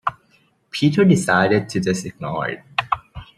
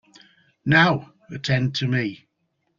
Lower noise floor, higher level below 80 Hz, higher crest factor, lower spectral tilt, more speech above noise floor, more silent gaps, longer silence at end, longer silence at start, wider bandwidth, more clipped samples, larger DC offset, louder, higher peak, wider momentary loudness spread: second, -59 dBFS vs -73 dBFS; about the same, -52 dBFS vs -56 dBFS; about the same, 18 dB vs 20 dB; about the same, -5.5 dB/octave vs -6 dB/octave; second, 41 dB vs 52 dB; neither; second, 0.15 s vs 0.65 s; second, 0.05 s vs 0.65 s; first, 13 kHz vs 7.4 kHz; neither; neither; about the same, -19 LUFS vs -21 LUFS; about the same, -2 dBFS vs -2 dBFS; second, 12 LU vs 15 LU